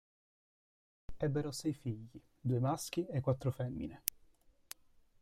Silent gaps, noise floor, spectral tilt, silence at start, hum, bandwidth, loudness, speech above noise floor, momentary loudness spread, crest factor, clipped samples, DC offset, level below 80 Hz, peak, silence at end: none; -66 dBFS; -6 dB/octave; 1.1 s; none; 16 kHz; -38 LUFS; 29 dB; 18 LU; 32 dB; under 0.1%; under 0.1%; -62 dBFS; -8 dBFS; 1.1 s